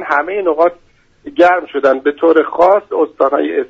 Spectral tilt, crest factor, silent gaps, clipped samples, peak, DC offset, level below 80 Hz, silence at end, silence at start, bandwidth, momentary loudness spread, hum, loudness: -5.5 dB/octave; 14 dB; none; under 0.1%; 0 dBFS; under 0.1%; -54 dBFS; 0.05 s; 0 s; 7.4 kHz; 5 LU; none; -13 LUFS